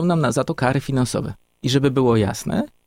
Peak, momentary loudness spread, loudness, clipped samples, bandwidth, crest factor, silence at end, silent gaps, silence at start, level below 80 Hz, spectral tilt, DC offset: -4 dBFS; 9 LU; -20 LUFS; under 0.1%; 16 kHz; 16 dB; 0.2 s; none; 0 s; -46 dBFS; -6 dB/octave; under 0.1%